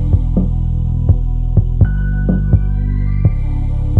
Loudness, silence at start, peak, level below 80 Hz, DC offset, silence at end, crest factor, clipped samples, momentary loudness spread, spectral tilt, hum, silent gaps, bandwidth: -16 LUFS; 0 s; 0 dBFS; -16 dBFS; under 0.1%; 0 s; 12 dB; under 0.1%; 4 LU; -11.5 dB/octave; none; none; 2.5 kHz